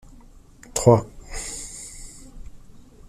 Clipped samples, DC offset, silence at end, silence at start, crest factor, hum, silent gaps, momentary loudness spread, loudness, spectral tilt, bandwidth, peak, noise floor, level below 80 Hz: under 0.1%; under 0.1%; 0.35 s; 0.75 s; 24 dB; none; none; 24 LU; -22 LUFS; -5.5 dB/octave; 15 kHz; -2 dBFS; -47 dBFS; -42 dBFS